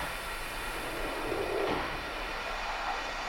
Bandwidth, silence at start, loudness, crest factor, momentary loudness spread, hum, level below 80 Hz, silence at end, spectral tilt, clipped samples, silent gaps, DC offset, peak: 18.5 kHz; 0 s; -34 LUFS; 16 dB; 5 LU; none; -44 dBFS; 0 s; -3.5 dB/octave; under 0.1%; none; under 0.1%; -20 dBFS